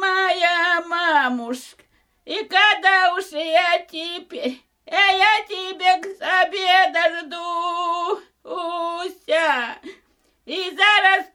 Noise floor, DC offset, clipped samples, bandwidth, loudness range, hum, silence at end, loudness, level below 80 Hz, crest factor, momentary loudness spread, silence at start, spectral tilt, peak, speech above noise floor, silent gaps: -62 dBFS; under 0.1%; under 0.1%; 15.5 kHz; 5 LU; none; 0.1 s; -19 LUFS; -68 dBFS; 18 dB; 15 LU; 0 s; -0.5 dB/octave; -4 dBFS; 42 dB; none